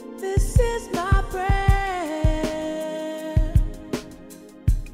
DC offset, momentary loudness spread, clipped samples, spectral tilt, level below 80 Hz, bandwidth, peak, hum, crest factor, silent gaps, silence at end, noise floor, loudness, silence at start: under 0.1%; 11 LU; under 0.1%; -6 dB/octave; -26 dBFS; 15.5 kHz; -6 dBFS; none; 18 dB; none; 0 s; -43 dBFS; -24 LUFS; 0 s